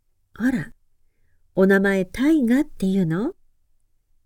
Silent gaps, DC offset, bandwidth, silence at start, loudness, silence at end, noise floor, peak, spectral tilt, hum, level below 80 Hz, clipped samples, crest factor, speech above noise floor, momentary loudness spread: none; under 0.1%; 16.5 kHz; 0.4 s; -21 LUFS; 0.95 s; -62 dBFS; -6 dBFS; -7.5 dB/octave; none; -48 dBFS; under 0.1%; 18 dB; 42 dB; 12 LU